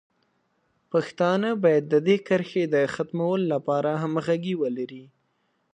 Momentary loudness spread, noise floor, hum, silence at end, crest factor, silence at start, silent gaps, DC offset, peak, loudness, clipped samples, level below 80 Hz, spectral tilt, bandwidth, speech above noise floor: 6 LU; -71 dBFS; none; 0.7 s; 18 dB; 0.95 s; none; under 0.1%; -8 dBFS; -24 LUFS; under 0.1%; -72 dBFS; -7 dB/octave; 9.8 kHz; 48 dB